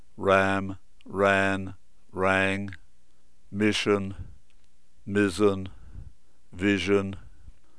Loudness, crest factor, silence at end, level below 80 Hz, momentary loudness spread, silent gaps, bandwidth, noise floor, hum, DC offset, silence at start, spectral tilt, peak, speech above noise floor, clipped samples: -25 LUFS; 22 dB; 0.3 s; -54 dBFS; 19 LU; none; 11 kHz; -65 dBFS; none; 0.8%; 0.2 s; -5.5 dB/octave; -6 dBFS; 40 dB; under 0.1%